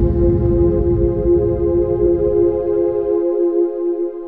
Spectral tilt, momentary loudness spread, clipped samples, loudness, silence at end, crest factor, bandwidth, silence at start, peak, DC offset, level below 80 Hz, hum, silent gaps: -13.5 dB/octave; 3 LU; under 0.1%; -16 LUFS; 0 s; 12 dB; 2.2 kHz; 0 s; -4 dBFS; under 0.1%; -26 dBFS; none; none